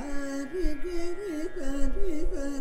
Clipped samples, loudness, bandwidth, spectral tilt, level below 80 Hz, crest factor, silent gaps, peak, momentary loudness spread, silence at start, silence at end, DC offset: under 0.1%; -34 LUFS; 9.4 kHz; -5.5 dB/octave; -32 dBFS; 14 dB; none; -12 dBFS; 2 LU; 0 s; 0 s; under 0.1%